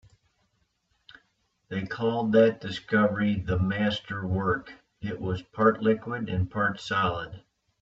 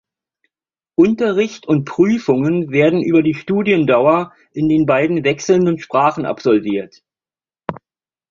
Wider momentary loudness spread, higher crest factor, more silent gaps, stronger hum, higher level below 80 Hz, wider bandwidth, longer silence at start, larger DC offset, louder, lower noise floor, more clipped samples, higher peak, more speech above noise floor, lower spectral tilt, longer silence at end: first, 13 LU vs 10 LU; first, 20 dB vs 14 dB; neither; neither; about the same, -54 dBFS vs -56 dBFS; about the same, 7.8 kHz vs 7.2 kHz; first, 1.7 s vs 1 s; neither; second, -27 LUFS vs -16 LUFS; second, -73 dBFS vs under -90 dBFS; neither; second, -8 dBFS vs -2 dBFS; second, 46 dB vs over 75 dB; about the same, -7.5 dB/octave vs -7 dB/octave; about the same, 0.45 s vs 0.55 s